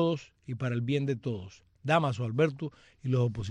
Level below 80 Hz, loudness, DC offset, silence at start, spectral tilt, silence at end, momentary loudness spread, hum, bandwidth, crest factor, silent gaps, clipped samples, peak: -60 dBFS; -31 LUFS; under 0.1%; 0 s; -7.5 dB/octave; 0 s; 13 LU; none; 9.4 kHz; 18 dB; none; under 0.1%; -12 dBFS